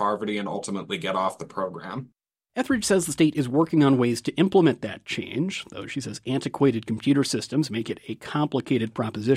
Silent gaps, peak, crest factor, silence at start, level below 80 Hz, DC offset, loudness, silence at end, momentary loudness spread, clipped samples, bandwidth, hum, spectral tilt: none; -8 dBFS; 18 dB; 0 s; -62 dBFS; under 0.1%; -25 LUFS; 0 s; 12 LU; under 0.1%; 13.5 kHz; none; -5.5 dB/octave